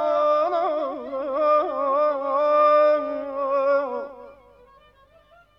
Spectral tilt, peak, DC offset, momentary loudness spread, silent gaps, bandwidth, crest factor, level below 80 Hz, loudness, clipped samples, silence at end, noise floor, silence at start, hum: -5 dB/octave; -8 dBFS; under 0.1%; 12 LU; none; 6 kHz; 14 dB; -64 dBFS; -22 LUFS; under 0.1%; 1.25 s; -55 dBFS; 0 s; none